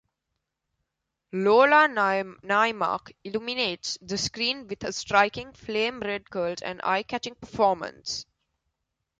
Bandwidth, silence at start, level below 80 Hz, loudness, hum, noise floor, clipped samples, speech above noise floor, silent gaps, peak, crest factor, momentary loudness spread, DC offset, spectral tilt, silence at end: 9.4 kHz; 1.35 s; -62 dBFS; -25 LUFS; none; -82 dBFS; under 0.1%; 57 dB; none; -6 dBFS; 22 dB; 14 LU; under 0.1%; -3 dB/octave; 0.95 s